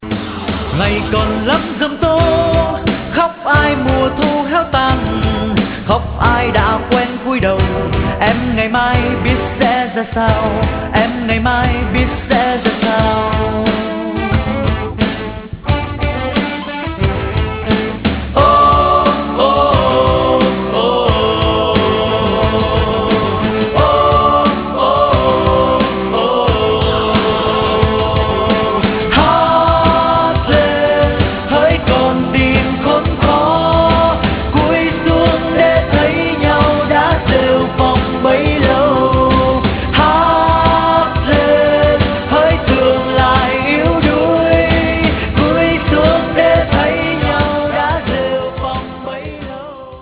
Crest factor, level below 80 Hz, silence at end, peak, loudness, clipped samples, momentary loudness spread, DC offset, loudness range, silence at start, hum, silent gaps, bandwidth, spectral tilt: 12 dB; -24 dBFS; 0 s; 0 dBFS; -13 LUFS; under 0.1%; 6 LU; under 0.1%; 3 LU; 0 s; none; none; 4 kHz; -10 dB/octave